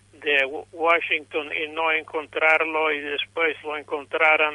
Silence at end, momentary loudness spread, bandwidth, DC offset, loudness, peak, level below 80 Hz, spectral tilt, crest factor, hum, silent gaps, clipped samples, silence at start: 0 s; 10 LU; 11.5 kHz; under 0.1%; -22 LUFS; -6 dBFS; -68 dBFS; -3.5 dB/octave; 18 dB; 50 Hz at -60 dBFS; none; under 0.1%; 0.2 s